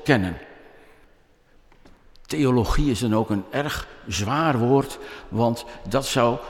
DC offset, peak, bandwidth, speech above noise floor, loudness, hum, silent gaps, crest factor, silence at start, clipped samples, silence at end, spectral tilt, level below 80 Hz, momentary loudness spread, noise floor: under 0.1%; -4 dBFS; 16.5 kHz; 34 dB; -23 LUFS; none; none; 20 dB; 0 s; under 0.1%; 0 s; -5.5 dB/octave; -36 dBFS; 11 LU; -56 dBFS